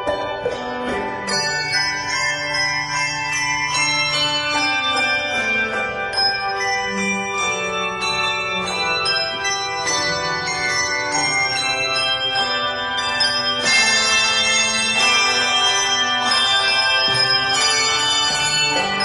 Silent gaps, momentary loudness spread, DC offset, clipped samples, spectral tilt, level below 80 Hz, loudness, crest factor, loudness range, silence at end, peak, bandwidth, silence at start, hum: none; 6 LU; under 0.1%; under 0.1%; -0.5 dB/octave; -50 dBFS; -17 LUFS; 16 dB; 5 LU; 0 s; -4 dBFS; 16 kHz; 0 s; none